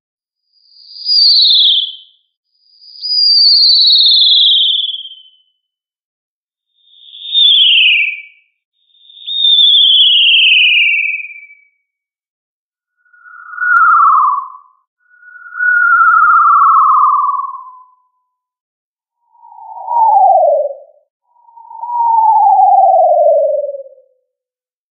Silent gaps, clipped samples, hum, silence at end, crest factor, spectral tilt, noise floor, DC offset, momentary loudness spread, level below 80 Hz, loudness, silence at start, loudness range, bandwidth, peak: 2.37-2.43 s, 6.03-6.47 s, 8.65-8.72 s, 12.29-12.72 s, 14.87-14.97 s, 18.61-18.95 s, 21.10-21.20 s; under 0.1%; none; 1.1 s; 12 dB; 14 dB/octave; -89 dBFS; under 0.1%; 17 LU; under -90 dBFS; -7 LUFS; 0.95 s; 8 LU; 5.2 kHz; 0 dBFS